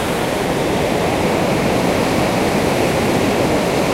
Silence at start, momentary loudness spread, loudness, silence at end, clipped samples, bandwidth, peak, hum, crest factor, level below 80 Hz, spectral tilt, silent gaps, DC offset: 0 s; 2 LU; -17 LUFS; 0 s; under 0.1%; 16 kHz; -4 dBFS; none; 12 dB; -36 dBFS; -5 dB/octave; none; under 0.1%